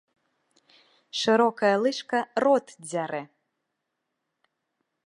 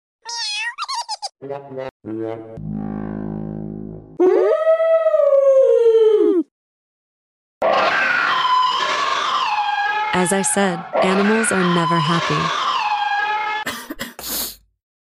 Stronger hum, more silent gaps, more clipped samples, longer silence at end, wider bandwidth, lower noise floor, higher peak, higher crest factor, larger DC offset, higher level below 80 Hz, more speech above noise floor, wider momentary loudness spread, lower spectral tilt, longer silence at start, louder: neither; second, none vs 1.91-2.00 s, 6.51-7.61 s; neither; first, 1.8 s vs 0.45 s; second, 11 kHz vs 16 kHz; second, -81 dBFS vs under -90 dBFS; about the same, -8 dBFS vs -6 dBFS; first, 20 dB vs 12 dB; neither; second, -80 dBFS vs -52 dBFS; second, 57 dB vs over 71 dB; second, 12 LU vs 16 LU; about the same, -4 dB/octave vs -4 dB/octave; first, 1.15 s vs 0.25 s; second, -25 LUFS vs -18 LUFS